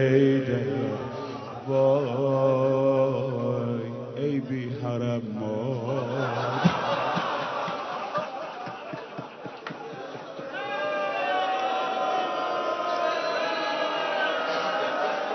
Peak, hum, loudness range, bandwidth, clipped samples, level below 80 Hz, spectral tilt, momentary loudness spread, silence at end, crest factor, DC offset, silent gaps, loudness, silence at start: -8 dBFS; none; 7 LU; 6.4 kHz; under 0.1%; -66 dBFS; -6.5 dB/octave; 14 LU; 0 s; 18 dB; under 0.1%; none; -27 LUFS; 0 s